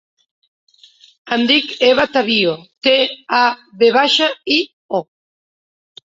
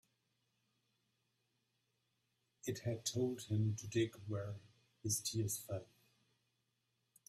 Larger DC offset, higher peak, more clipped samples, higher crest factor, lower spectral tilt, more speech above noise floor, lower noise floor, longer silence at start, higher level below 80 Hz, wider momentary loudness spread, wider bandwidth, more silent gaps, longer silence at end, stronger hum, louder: neither; first, -2 dBFS vs -26 dBFS; neither; about the same, 16 dB vs 18 dB; second, -3.5 dB/octave vs -5 dB/octave; second, 33 dB vs 44 dB; second, -48 dBFS vs -85 dBFS; second, 1.25 s vs 2.65 s; first, -60 dBFS vs -76 dBFS; about the same, 9 LU vs 10 LU; second, 7.8 kHz vs 15.5 kHz; first, 4.73-4.89 s vs none; second, 1.1 s vs 1.45 s; neither; first, -15 LUFS vs -41 LUFS